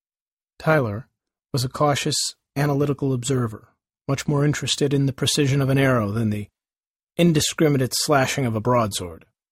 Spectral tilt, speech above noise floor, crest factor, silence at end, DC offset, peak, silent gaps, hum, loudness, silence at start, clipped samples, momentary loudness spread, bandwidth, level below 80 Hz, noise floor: -5 dB/octave; over 69 dB; 18 dB; 0.35 s; under 0.1%; -4 dBFS; 6.87-6.94 s, 7.03-7.07 s; none; -22 LUFS; 0.6 s; under 0.1%; 10 LU; 16 kHz; -52 dBFS; under -90 dBFS